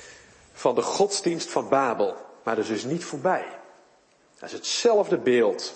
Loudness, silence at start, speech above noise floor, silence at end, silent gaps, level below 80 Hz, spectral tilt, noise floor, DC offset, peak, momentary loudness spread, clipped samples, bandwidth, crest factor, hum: -25 LUFS; 0 s; 36 dB; 0 s; none; -72 dBFS; -3.5 dB/octave; -60 dBFS; under 0.1%; -6 dBFS; 11 LU; under 0.1%; 8.8 kHz; 20 dB; none